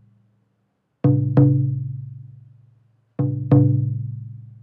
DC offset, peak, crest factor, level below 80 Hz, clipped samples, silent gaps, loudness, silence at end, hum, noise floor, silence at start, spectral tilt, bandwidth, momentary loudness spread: under 0.1%; -2 dBFS; 20 dB; -50 dBFS; under 0.1%; none; -20 LUFS; 0.1 s; none; -70 dBFS; 1.05 s; -13.5 dB/octave; 2.7 kHz; 21 LU